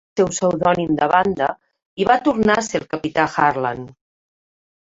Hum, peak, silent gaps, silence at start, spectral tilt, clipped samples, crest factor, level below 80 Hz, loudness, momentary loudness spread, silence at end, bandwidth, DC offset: none; -2 dBFS; 1.86-1.97 s; 0.15 s; -5 dB/octave; under 0.1%; 18 dB; -52 dBFS; -19 LUFS; 10 LU; 0.95 s; 8 kHz; under 0.1%